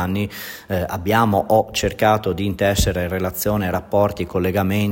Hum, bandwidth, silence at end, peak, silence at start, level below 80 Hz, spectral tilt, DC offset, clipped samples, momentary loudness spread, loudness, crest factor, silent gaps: none; 16.5 kHz; 0 s; -4 dBFS; 0 s; -36 dBFS; -5.5 dB/octave; under 0.1%; under 0.1%; 7 LU; -20 LUFS; 16 dB; none